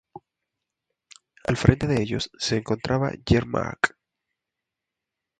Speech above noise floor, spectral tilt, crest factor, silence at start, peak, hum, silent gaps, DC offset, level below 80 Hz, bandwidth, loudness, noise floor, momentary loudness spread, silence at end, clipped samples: 63 dB; -6 dB/octave; 26 dB; 0.15 s; 0 dBFS; none; none; under 0.1%; -42 dBFS; 10.5 kHz; -24 LUFS; -86 dBFS; 8 LU; 1.5 s; under 0.1%